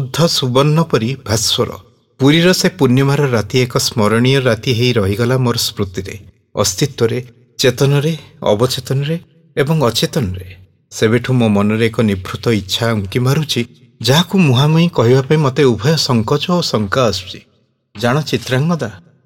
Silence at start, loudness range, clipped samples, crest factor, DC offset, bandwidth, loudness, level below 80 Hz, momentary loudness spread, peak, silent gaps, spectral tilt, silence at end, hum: 0 s; 4 LU; under 0.1%; 14 dB; under 0.1%; 17 kHz; -14 LUFS; -50 dBFS; 10 LU; 0 dBFS; none; -5 dB/octave; 0.25 s; none